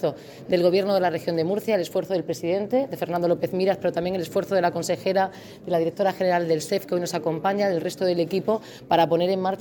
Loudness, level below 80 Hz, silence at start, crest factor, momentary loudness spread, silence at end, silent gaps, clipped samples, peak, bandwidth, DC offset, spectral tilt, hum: -24 LUFS; -64 dBFS; 0 s; 16 dB; 6 LU; 0 s; none; under 0.1%; -8 dBFS; 19 kHz; under 0.1%; -5.5 dB/octave; none